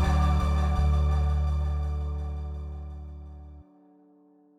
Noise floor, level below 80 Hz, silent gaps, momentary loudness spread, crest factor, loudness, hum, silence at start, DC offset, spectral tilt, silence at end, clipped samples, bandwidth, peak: -59 dBFS; -28 dBFS; none; 19 LU; 14 dB; -28 LUFS; none; 0 s; under 0.1%; -7.5 dB/octave; 0.95 s; under 0.1%; 7.4 kHz; -12 dBFS